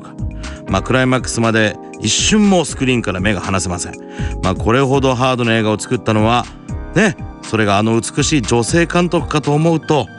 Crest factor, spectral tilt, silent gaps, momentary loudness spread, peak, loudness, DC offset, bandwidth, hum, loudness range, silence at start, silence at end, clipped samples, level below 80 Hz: 14 dB; -4.5 dB/octave; none; 10 LU; -2 dBFS; -15 LUFS; under 0.1%; 11 kHz; none; 1 LU; 0 s; 0 s; under 0.1%; -32 dBFS